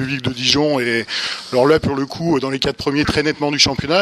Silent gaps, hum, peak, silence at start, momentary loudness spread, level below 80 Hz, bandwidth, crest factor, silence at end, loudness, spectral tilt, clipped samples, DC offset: none; none; 0 dBFS; 0 s; 7 LU; -42 dBFS; 13.5 kHz; 18 dB; 0 s; -17 LUFS; -4 dB/octave; under 0.1%; under 0.1%